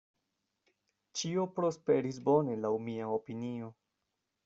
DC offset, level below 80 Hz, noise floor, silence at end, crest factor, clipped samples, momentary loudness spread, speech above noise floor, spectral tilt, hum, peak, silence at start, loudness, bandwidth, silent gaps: under 0.1%; -76 dBFS; -85 dBFS; 0.75 s; 18 dB; under 0.1%; 11 LU; 52 dB; -6 dB/octave; none; -16 dBFS; 1.15 s; -34 LUFS; 7.8 kHz; none